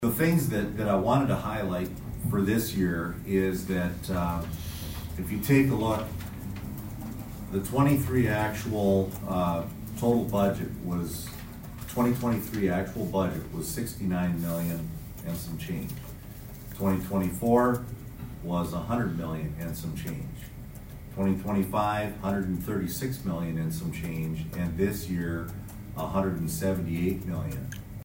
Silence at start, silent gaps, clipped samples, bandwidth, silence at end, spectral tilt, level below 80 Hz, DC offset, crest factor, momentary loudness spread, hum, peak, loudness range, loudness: 0 s; none; under 0.1%; 16.5 kHz; 0 s; -6.5 dB/octave; -46 dBFS; under 0.1%; 20 dB; 14 LU; none; -10 dBFS; 4 LU; -29 LUFS